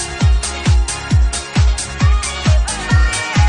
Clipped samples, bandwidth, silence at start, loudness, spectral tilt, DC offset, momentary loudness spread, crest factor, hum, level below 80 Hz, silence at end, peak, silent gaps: under 0.1%; 10.5 kHz; 0 s; -16 LUFS; -4 dB/octave; under 0.1%; 2 LU; 12 dB; none; -16 dBFS; 0 s; -2 dBFS; none